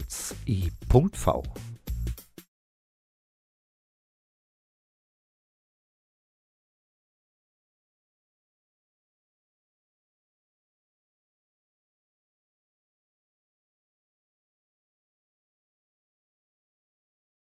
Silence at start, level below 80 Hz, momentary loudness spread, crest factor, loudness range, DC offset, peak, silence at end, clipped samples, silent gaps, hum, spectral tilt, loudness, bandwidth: 0 s; -44 dBFS; 17 LU; 30 dB; 14 LU; under 0.1%; -6 dBFS; 15.05 s; under 0.1%; none; none; -6.5 dB/octave; -28 LUFS; 15.5 kHz